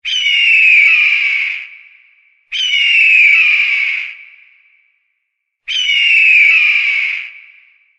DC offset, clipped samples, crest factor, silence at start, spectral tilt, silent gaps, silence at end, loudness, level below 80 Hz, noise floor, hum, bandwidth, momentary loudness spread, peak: under 0.1%; under 0.1%; 12 dB; 0.05 s; 4.5 dB/octave; none; 0.6 s; -8 LUFS; -62 dBFS; -71 dBFS; none; 8.8 kHz; 14 LU; 0 dBFS